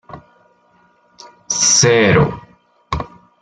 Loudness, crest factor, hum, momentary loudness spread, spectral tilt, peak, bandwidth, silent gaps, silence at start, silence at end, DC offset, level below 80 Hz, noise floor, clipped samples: -13 LUFS; 16 dB; none; 19 LU; -3 dB/octave; -2 dBFS; 11 kHz; none; 0.1 s; 0.35 s; under 0.1%; -40 dBFS; -55 dBFS; under 0.1%